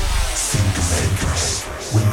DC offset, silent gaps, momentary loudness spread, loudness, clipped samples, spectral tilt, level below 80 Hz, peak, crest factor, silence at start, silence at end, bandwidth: under 0.1%; none; 3 LU; -19 LUFS; under 0.1%; -3.5 dB/octave; -26 dBFS; -6 dBFS; 12 dB; 0 s; 0 s; 18 kHz